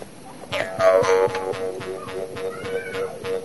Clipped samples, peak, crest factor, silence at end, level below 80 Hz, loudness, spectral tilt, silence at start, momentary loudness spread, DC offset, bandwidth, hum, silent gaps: under 0.1%; -4 dBFS; 18 dB; 0 s; -56 dBFS; -23 LUFS; -4 dB/octave; 0 s; 14 LU; 0.4%; 11.5 kHz; none; none